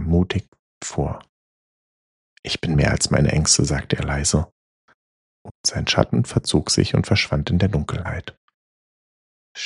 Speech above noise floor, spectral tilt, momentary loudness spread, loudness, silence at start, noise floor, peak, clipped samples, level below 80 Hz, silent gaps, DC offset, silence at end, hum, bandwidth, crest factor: over 70 dB; -4.5 dB/octave; 13 LU; -20 LUFS; 0 s; under -90 dBFS; -2 dBFS; under 0.1%; -36 dBFS; 0.48-0.52 s, 0.59-0.81 s, 1.29-2.43 s, 4.52-4.88 s, 4.94-5.45 s, 5.51-5.64 s, 8.37-8.48 s, 8.54-9.55 s; under 0.1%; 0 s; none; 11.5 kHz; 22 dB